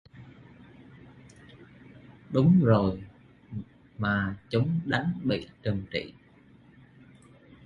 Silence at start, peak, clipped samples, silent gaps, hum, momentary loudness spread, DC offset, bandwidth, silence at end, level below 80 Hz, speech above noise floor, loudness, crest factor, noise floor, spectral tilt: 0.15 s; -8 dBFS; under 0.1%; none; none; 21 LU; under 0.1%; 7.4 kHz; 1.55 s; -54 dBFS; 31 dB; -27 LUFS; 22 dB; -57 dBFS; -8.5 dB/octave